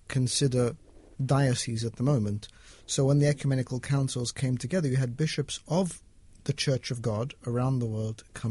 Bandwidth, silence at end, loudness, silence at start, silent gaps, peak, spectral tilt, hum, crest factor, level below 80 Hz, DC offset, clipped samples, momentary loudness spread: 11.5 kHz; 0 s; -29 LUFS; 0.1 s; none; -12 dBFS; -5.5 dB/octave; none; 16 dB; -54 dBFS; under 0.1%; under 0.1%; 10 LU